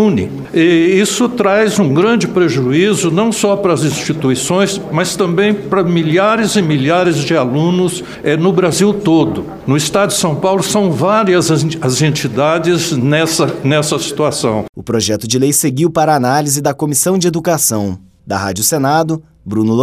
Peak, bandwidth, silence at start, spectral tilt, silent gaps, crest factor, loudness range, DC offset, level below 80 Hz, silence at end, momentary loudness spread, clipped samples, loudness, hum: 0 dBFS; 16 kHz; 0 s; -4.5 dB/octave; 14.69-14.73 s; 12 dB; 2 LU; under 0.1%; -48 dBFS; 0 s; 5 LU; under 0.1%; -13 LUFS; none